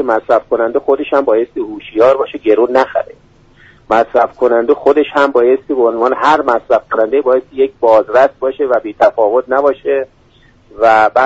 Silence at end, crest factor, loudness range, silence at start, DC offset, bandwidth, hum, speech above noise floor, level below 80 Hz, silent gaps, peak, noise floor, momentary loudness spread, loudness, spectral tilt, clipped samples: 0 s; 12 dB; 2 LU; 0 s; under 0.1%; 8 kHz; none; 35 dB; -50 dBFS; none; 0 dBFS; -47 dBFS; 6 LU; -12 LUFS; -5.5 dB/octave; under 0.1%